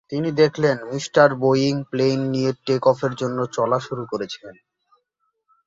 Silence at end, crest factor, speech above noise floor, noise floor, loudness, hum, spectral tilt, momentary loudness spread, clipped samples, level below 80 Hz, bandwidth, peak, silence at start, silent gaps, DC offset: 1.15 s; 20 dB; 53 dB; -73 dBFS; -21 LUFS; none; -6 dB/octave; 11 LU; under 0.1%; -62 dBFS; 7.8 kHz; -2 dBFS; 0.1 s; none; under 0.1%